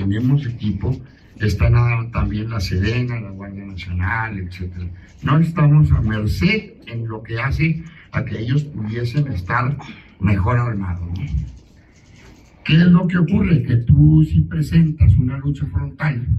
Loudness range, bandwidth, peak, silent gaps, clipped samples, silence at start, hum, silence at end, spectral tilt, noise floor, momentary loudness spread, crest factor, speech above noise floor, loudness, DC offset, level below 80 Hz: 7 LU; 8 kHz; -2 dBFS; none; under 0.1%; 0 s; none; 0 s; -8 dB/octave; -47 dBFS; 15 LU; 16 dB; 30 dB; -18 LUFS; under 0.1%; -32 dBFS